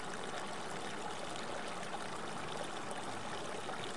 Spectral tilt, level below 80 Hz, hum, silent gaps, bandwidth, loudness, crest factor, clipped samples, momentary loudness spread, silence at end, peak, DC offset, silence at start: -3 dB/octave; -72 dBFS; none; none; 11.5 kHz; -43 LUFS; 16 dB; under 0.1%; 1 LU; 0 s; -26 dBFS; 0.5%; 0 s